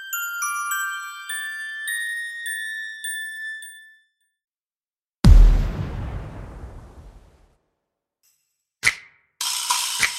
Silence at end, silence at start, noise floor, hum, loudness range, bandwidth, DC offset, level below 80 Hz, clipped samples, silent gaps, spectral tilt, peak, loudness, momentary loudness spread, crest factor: 0 s; 0 s; under -90 dBFS; none; 7 LU; 16.5 kHz; under 0.1%; -24 dBFS; under 0.1%; 4.44-4.61 s, 4.78-4.91 s, 5.08-5.13 s, 5.19-5.23 s; -3 dB/octave; -2 dBFS; -23 LUFS; 20 LU; 22 dB